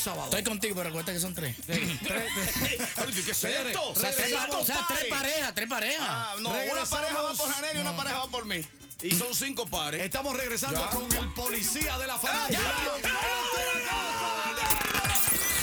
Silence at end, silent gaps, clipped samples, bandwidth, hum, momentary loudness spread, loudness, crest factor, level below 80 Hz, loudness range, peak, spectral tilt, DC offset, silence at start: 0 s; none; under 0.1%; over 20 kHz; none; 5 LU; -29 LUFS; 22 dB; -48 dBFS; 2 LU; -8 dBFS; -2 dB/octave; under 0.1%; 0 s